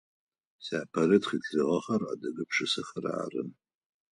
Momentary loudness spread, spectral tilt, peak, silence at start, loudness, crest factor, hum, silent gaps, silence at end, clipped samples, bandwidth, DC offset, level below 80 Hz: 11 LU; -5 dB/octave; -10 dBFS; 0.6 s; -30 LUFS; 22 dB; none; none; 0.6 s; under 0.1%; 11 kHz; under 0.1%; -72 dBFS